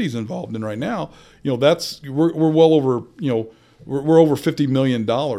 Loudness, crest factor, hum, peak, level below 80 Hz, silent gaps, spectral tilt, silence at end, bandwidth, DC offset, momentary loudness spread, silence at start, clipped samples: -19 LUFS; 18 dB; none; -2 dBFS; -58 dBFS; none; -7 dB/octave; 0 s; 15 kHz; under 0.1%; 13 LU; 0 s; under 0.1%